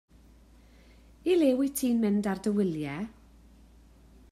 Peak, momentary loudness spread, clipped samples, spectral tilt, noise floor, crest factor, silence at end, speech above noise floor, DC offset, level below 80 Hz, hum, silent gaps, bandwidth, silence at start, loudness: -14 dBFS; 12 LU; under 0.1%; -6 dB/octave; -56 dBFS; 16 dB; 1.2 s; 29 dB; under 0.1%; -58 dBFS; none; none; 14.5 kHz; 1.25 s; -28 LUFS